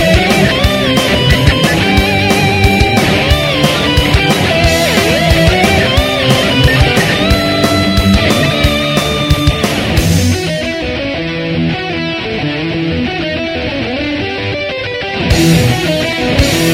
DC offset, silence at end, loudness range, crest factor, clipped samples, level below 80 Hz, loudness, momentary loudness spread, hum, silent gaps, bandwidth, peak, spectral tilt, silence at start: under 0.1%; 0 s; 6 LU; 12 dB; 0.2%; -22 dBFS; -11 LUFS; 7 LU; none; none; 17 kHz; 0 dBFS; -5 dB/octave; 0 s